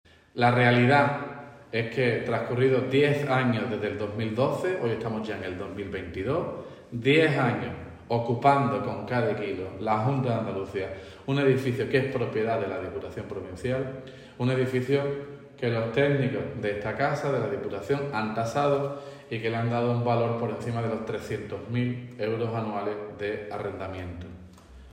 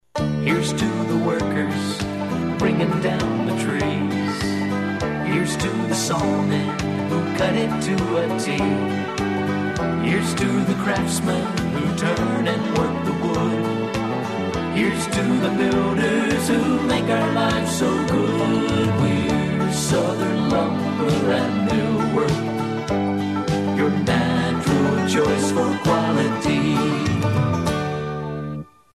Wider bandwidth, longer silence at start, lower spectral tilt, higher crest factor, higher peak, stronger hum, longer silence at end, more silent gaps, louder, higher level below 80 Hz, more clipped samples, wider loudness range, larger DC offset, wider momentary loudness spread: second, 10.5 kHz vs 14 kHz; first, 0.35 s vs 0.15 s; first, -7 dB/octave vs -5.5 dB/octave; first, 20 dB vs 14 dB; about the same, -8 dBFS vs -8 dBFS; neither; second, 0 s vs 0.3 s; neither; second, -27 LUFS vs -21 LUFS; second, -58 dBFS vs -44 dBFS; neither; first, 5 LU vs 2 LU; neither; first, 13 LU vs 4 LU